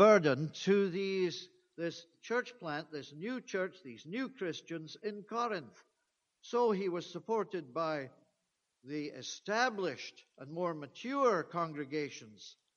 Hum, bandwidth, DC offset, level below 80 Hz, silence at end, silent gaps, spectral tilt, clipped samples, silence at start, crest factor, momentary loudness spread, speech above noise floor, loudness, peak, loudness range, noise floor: none; 7.2 kHz; under 0.1%; -86 dBFS; 0.25 s; none; -5 dB/octave; under 0.1%; 0 s; 24 dB; 15 LU; 47 dB; -36 LUFS; -12 dBFS; 4 LU; -84 dBFS